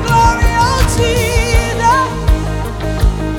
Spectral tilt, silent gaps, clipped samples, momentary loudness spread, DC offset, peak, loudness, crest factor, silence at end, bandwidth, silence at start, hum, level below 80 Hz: -5 dB/octave; none; under 0.1%; 6 LU; under 0.1%; 0 dBFS; -13 LUFS; 12 dB; 0 s; 18 kHz; 0 s; none; -16 dBFS